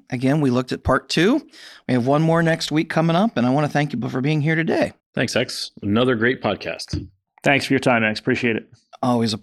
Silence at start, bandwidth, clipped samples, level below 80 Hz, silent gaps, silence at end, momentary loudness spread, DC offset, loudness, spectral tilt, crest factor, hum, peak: 0.1 s; 13 kHz; under 0.1%; -50 dBFS; 5.06-5.13 s; 0.05 s; 8 LU; under 0.1%; -20 LUFS; -6 dB/octave; 18 dB; none; -2 dBFS